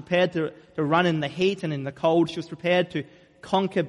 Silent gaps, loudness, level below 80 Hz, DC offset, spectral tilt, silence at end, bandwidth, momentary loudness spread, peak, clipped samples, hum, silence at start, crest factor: none; -25 LUFS; -64 dBFS; under 0.1%; -6.5 dB/octave; 0 s; 11.5 kHz; 8 LU; -8 dBFS; under 0.1%; none; 0 s; 18 dB